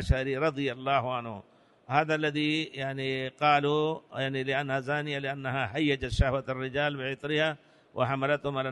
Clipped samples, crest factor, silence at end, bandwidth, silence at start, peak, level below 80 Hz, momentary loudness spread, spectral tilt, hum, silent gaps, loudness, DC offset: under 0.1%; 20 dB; 0 s; 11.5 kHz; 0 s; -10 dBFS; -42 dBFS; 7 LU; -6 dB/octave; none; none; -29 LUFS; under 0.1%